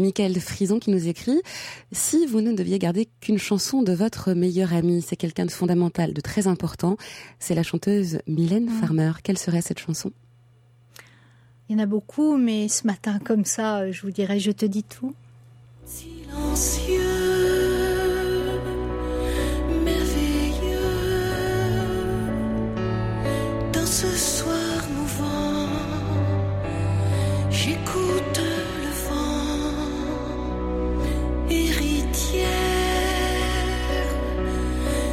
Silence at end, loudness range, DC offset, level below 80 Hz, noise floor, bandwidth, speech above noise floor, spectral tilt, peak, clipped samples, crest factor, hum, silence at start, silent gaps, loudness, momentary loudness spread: 0 s; 3 LU; under 0.1%; -32 dBFS; -55 dBFS; 16.5 kHz; 32 dB; -5 dB/octave; -10 dBFS; under 0.1%; 14 dB; none; 0 s; none; -24 LUFS; 6 LU